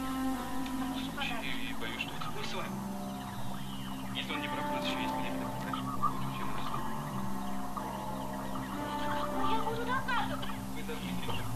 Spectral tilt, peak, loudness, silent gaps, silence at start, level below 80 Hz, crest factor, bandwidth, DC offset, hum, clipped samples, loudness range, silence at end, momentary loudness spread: -5 dB/octave; -18 dBFS; -36 LUFS; none; 0 s; -52 dBFS; 16 dB; 14 kHz; under 0.1%; none; under 0.1%; 2 LU; 0 s; 6 LU